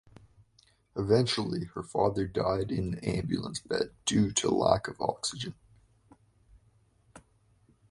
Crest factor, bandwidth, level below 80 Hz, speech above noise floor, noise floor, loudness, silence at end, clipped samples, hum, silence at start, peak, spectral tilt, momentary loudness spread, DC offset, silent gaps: 24 dB; 11.5 kHz; -54 dBFS; 36 dB; -66 dBFS; -30 LUFS; 0.7 s; under 0.1%; none; 0.95 s; -8 dBFS; -5 dB/octave; 9 LU; under 0.1%; none